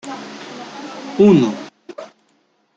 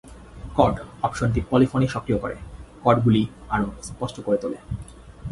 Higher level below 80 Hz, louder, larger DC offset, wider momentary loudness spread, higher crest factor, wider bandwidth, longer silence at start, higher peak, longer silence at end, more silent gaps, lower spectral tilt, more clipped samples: second, -62 dBFS vs -40 dBFS; first, -14 LUFS vs -23 LUFS; neither; first, 24 LU vs 16 LU; about the same, 18 dB vs 22 dB; second, 7.8 kHz vs 11.5 kHz; about the same, 0.05 s vs 0.05 s; about the same, -2 dBFS vs -2 dBFS; first, 0.7 s vs 0 s; neither; about the same, -7 dB/octave vs -7 dB/octave; neither